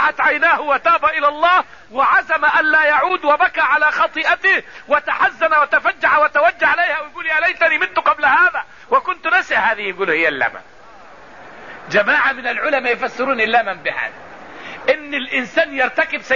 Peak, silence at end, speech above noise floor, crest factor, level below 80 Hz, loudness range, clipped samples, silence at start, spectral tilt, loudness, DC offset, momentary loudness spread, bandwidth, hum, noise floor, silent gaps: -4 dBFS; 0 s; 26 dB; 14 dB; -56 dBFS; 4 LU; under 0.1%; 0 s; -3.5 dB/octave; -15 LUFS; 0.5%; 7 LU; 7.4 kHz; none; -42 dBFS; none